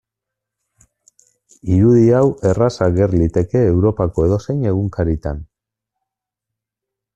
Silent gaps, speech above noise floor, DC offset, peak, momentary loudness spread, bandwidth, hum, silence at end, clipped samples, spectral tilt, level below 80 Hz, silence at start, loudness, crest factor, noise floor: none; 69 dB; under 0.1%; -2 dBFS; 9 LU; 8.2 kHz; none; 1.7 s; under 0.1%; -9 dB/octave; -38 dBFS; 1.65 s; -16 LUFS; 16 dB; -83 dBFS